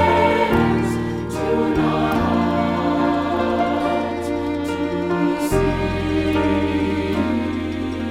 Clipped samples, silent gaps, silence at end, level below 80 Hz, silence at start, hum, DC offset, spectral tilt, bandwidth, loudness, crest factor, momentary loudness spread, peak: under 0.1%; none; 0 s; -36 dBFS; 0 s; none; under 0.1%; -6.5 dB/octave; 15.5 kHz; -20 LUFS; 14 dB; 6 LU; -4 dBFS